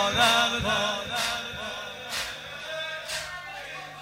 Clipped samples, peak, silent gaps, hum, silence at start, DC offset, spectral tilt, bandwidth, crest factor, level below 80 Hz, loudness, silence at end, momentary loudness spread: under 0.1%; -8 dBFS; none; none; 0 s; under 0.1%; -2 dB/octave; 16 kHz; 20 dB; -54 dBFS; -27 LUFS; 0 s; 16 LU